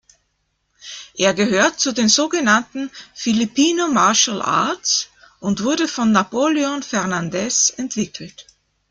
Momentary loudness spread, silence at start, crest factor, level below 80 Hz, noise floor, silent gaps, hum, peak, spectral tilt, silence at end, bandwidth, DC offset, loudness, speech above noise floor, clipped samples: 14 LU; 0.85 s; 18 dB; -60 dBFS; -69 dBFS; none; none; -2 dBFS; -2.5 dB/octave; 0.5 s; 10 kHz; under 0.1%; -18 LUFS; 51 dB; under 0.1%